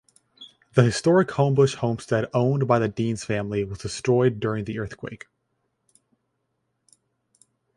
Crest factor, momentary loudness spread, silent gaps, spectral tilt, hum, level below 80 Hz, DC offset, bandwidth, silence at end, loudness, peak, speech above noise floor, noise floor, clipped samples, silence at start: 22 dB; 12 LU; none; -6.5 dB/octave; none; -54 dBFS; under 0.1%; 11.5 kHz; 2.6 s; -23 LUFS; -4 dBFS; 53 dB; -75 dBFS; under 0.1%; 0.4 s